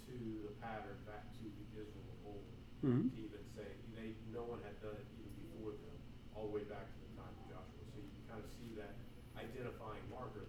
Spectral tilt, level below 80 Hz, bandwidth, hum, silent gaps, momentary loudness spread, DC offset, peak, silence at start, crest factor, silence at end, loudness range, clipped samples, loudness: -8 dB/octave; -60 dBFS; 20 kHz; none; none; 12 LU; under 0.1%; -26 dBFS; 0 s; 22 dB; 0 s; 7 LU; under 0.1%; -49 LUFS